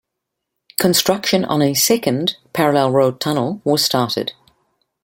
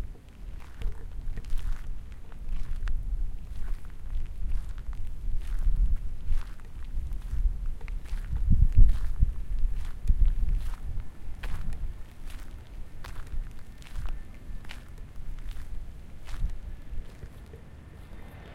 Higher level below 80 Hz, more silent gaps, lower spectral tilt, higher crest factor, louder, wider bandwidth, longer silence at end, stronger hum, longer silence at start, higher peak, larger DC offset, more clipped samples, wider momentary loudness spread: second, -58 dBFS vs -28 dBFS; neither; second, -4 dB/octave vs -7 dB/octave; about the same, 18 dB vs 20 dB; first, -17 LUFS vs -36 LUFS; first, 17 kHz vs 4.7 kHz; first, 0.7 s vs 0 s; neither; first, 0.8 s vs 0 s; first, 0 dBFS vs -6 dBFS; neither; neither; second, 6 LU vs 17 LU